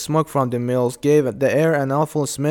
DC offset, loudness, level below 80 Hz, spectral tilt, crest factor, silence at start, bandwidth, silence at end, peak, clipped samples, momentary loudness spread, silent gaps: under 0.1%; -19 LUFS; -56 dBFS; -6 dB/octave; 14 dB; 0 s; 19 kHz; 0 s; -6 dBFS; under 0.1%; 4 LU; none